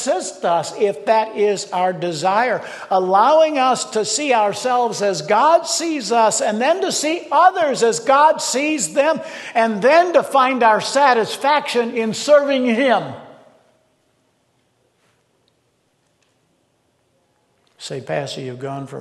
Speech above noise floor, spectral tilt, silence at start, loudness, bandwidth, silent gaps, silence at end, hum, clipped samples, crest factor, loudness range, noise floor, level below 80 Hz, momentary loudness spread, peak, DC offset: 47 dB; -3 dB/octave; 0 s; -17 LUFS; 12.5 kHz; none; 0 s; none; under 0.1%; 16 dB; 8 LU; -64 dBFS; -72 dBFS; 11 LU; -2 dBFS; under 0.1%